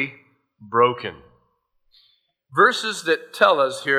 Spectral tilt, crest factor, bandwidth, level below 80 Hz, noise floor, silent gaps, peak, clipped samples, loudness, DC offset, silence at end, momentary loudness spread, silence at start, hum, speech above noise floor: -3.5 dB/octave; 20 dB; 15 kHz; -68 dBFS; -67 dBFS; none; -2 dBFS; under 0.1%; -20 LUFS; under 0.1%; 0 s; 12 LU; 0 s; none; 48 dB